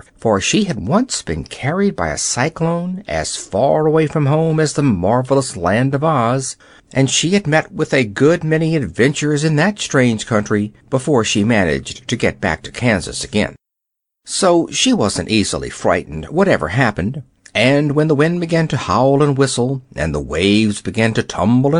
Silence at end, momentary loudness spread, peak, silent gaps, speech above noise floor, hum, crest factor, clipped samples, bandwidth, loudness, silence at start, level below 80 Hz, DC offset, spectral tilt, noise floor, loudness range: 0 s; 7 LU; -2 dBFS; none; 64 dB; none; 14 dB; under 0.1%; 11 kHz; -16 LUFS; 0.2 s; -40 dBFS; under 0.1%; -5 dB/octave; -79 dBFS; 2 LU